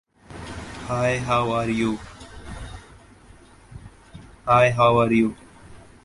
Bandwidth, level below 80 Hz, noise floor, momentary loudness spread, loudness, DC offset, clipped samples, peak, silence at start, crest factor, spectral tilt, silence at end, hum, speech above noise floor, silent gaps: 11.5 kHz; -46 dBFS; -49 dBFS; 24 LU; -21 LUFS; under 0.1%; under 0.1%; -4 dBFS; 0.3 s; 20 dB; -6.5 dB/octave; 0.25 s; none; 29 dB; none